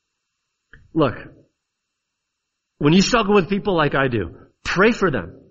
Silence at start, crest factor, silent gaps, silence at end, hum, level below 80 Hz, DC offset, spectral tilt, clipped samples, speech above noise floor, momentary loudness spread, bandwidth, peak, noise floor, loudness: 0.95 s; 20 dB; none; 0.2 s; none; -42 dBFS; under 0.1%; -5.5 dB/octave; under 0.1%; 60 dB; 12 LU; 7.8 kHz; -2 dBFS; -78 dBFS; -19 LUFS